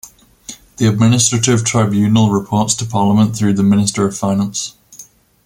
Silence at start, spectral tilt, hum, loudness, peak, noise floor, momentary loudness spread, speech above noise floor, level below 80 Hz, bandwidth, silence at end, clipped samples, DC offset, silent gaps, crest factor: 0.05 s; -5 dB/octave; none; -14 LUFS; 0 dBFS; -42 dBFS; 10 LU; 28 dB; -48 dBFS; 16 kHz; 0.45 s; under 0.1%; under 0.1%; none; 14 dB